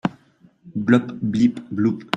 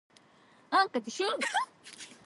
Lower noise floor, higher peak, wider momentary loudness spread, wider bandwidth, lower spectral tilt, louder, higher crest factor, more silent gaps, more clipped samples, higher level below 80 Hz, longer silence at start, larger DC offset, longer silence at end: second, -55 dBFS vs -61 dBFS; first, -2 dBFS vs -14 dBFS; second, 9 LU vs 17 LU; second, 8 kHz vs 11.5 kHz; first, -7 dB/octave vs -1.5 dB/octave; first, -21 LUFS vs -31 LUFS; about the same, 20 dB vs 20 dB; neither; neither; first, -58 dBFS vs -88 dBFS; second, 0.05 s vs 0.7 s; neither; about the same, 0 s vs 0.1 s